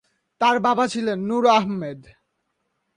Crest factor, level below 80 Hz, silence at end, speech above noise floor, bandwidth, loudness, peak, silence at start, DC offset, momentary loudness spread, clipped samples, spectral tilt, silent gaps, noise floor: 18 dB; -64 dBFS; 0.95 s; 54 dB; 11.5 kHz; -20 LUFS; -6 dBFS; 0.4 s; under 0.1%; 11 LU; under 0.1%; -5 dB/octave; none; -74 dBFS